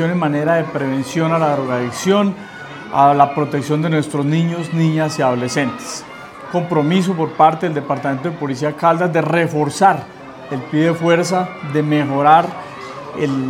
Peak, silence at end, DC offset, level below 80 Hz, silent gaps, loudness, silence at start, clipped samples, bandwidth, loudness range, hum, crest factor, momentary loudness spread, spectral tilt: 0 dBFS; 0 s; under 0.1%; -60 dBFS; none; -17 LUFS; 0 s; under 0.1%; 14.5 kHz; 2 LU; none; 16 dB; 14 LU; -6 dB/octave